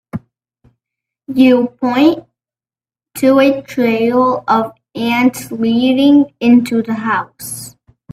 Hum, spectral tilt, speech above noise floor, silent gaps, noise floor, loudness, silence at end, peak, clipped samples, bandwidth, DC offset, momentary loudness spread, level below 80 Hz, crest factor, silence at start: none; -5 dB/octave; over 78 dB; none; under -90 dBFS; -13 LUFS; 0.45 s; 0 dBFS; under 0.1%; 15.5 kHz; under 0.1%; 15 LU; -56 dBFS; 14 dB; 0.15 s